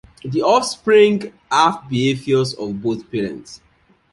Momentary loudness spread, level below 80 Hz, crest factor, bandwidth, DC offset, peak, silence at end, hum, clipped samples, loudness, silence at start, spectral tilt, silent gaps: 12 LU; -56 dBFS; 18 dB; 11.5 kHz; under 0.1%; -2 dBFS; 0.55 s; none; under 0.1%; -18 LUFS; 0.25 s; -5 dB/octave; none